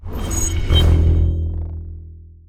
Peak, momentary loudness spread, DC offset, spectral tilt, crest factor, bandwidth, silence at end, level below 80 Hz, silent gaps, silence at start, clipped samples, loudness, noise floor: -2 dBFS; 18 LU; under 0.1%; -5 dB/octave; 16 dB; 14 kHz; 0.25 s; -22 dBFS; none; 0 s; under 0.1%; -18 LUFS; -38 dBFS